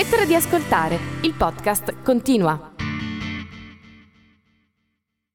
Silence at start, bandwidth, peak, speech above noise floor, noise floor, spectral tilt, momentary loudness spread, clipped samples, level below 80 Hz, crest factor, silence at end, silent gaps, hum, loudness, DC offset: 0 s; over 20 kHz; -6 dBFS; 56 dB; -76 dBFS; -4.5 dB/octave; 12 LU; under 0.1%; -44 dBFS; 16 dB; 1.45 s; none; none; -21 LUFS; under 0.1%